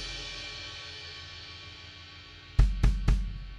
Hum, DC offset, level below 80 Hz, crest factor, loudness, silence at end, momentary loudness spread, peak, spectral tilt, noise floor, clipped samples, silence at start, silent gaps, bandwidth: none; under 0.1%; -32 dBFS; 22 dB; -33 LUFS; 0 s; 18 LU; -8 dBFS; -5 dB/octave; -48 dBFS; under 0.1%; 0 s; none; 9.4 kHz